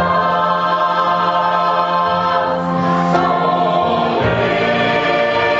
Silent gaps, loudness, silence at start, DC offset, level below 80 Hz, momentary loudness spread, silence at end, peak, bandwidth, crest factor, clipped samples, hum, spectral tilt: none; -15 LUFS; 0 s; under 0.1%; -44 dBFS; 1 LU; 0 s; 0 dBFS; 7.8 kHz; 14 dB; under 0.1%; none; -3.5 dB/octave